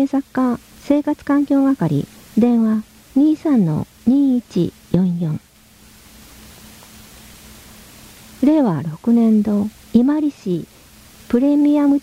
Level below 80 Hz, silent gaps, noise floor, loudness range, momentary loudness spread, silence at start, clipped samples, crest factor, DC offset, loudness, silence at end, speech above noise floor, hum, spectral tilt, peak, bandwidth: -50 dBFS; none; -47 dBFS; 8 LU; 9 LU; 0 s; under 0.1%; 16 dB; under 0.1%; -17 LUFS; 0 s; 31 dB; none; -8 dB/octave; 0 dBFS; 16 kHz